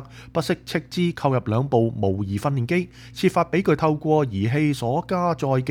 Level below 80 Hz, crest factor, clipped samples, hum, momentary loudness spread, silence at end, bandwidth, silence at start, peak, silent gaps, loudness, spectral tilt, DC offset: -52 dBFS; 16 dB; under 0.1%; none; 5 LU; 0 s; 17 kHz; 0 s; -6 dBFS; none; -23 LUFS; -7 dB/octave; under 0.1%